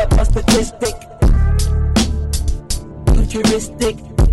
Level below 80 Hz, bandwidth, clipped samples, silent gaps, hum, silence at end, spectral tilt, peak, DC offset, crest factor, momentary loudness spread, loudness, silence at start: -16 dBFS; 13 kHz; under 0.1%; none; none; 0 s; -5.5 dB/octave; -6 dBFS; under 0.1%; 8 dB; 8 LU; -17 LUFS; 0 s